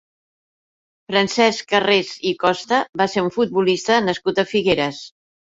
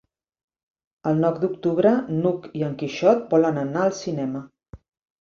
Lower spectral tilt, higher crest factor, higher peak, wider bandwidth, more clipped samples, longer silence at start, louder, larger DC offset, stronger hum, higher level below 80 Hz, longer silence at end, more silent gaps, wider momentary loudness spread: second, -4 dB/octave vs -7 dB/octave; about the same, 18 dB vs 18 dB; about the same, -2 dBFS vs -4 dBFS; about the same, 8 kHz vs 7.4 kHz; neither; about the same, 1.1 s vs 1.05 s; first, -19 LUFS vs -22 LUFS; neither; neither; about the same, -58 dBFS vs -60 dBFS; about the same, 0.4 s vs 0.45 s; first, 2.89-2.93 s vs none; second, 4 LU vs 9 LU